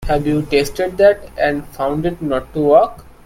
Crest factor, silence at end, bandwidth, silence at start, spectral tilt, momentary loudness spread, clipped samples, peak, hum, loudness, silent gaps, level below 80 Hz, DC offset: 16 dB; 0.15 s; 16.5 kHz; 0 s; -6 dB/octave; 8 LU; under 0.1%; 0 dBFS; none; -16 LUFS; none; -34 dBFS; under 0.1%